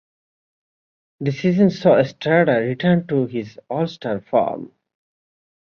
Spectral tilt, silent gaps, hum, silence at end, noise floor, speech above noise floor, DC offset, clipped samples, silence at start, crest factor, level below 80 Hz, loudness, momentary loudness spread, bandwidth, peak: -8 dB/octave; none; none; 0.95 s; under -90 dBFS; over 71 dB; under 0.1%; under 0.1%; 1.2 s; 18 dB; -60 dBFS; -19 LUFS; 11 LU; 6.8 kHz; -2 dBFS